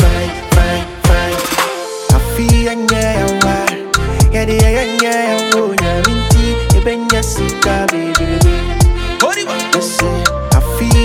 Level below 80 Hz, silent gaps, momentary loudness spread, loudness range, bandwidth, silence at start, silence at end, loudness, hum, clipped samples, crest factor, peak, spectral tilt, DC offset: -18 dBFS; none; 3 LU; 1 LU; 17.5 kHz; 0 s; 0 s; -13 LUFS; none; under 0.1%; 12 dB; 0 dBFS; -4.5 dB/octave; under 0.1%